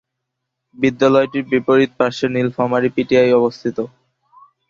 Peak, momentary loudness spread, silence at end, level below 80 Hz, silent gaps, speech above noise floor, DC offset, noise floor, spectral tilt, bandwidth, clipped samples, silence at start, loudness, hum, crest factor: -2 dBFS; 9 LU; 0.85 s; -58 dBFS; none; 62 dB; under 0.1%; -78 dBFS; -6.5 dB/octave; 7.4 kHz; under 0.1%; 0.8 s; -16 LUFS; none; 16 dB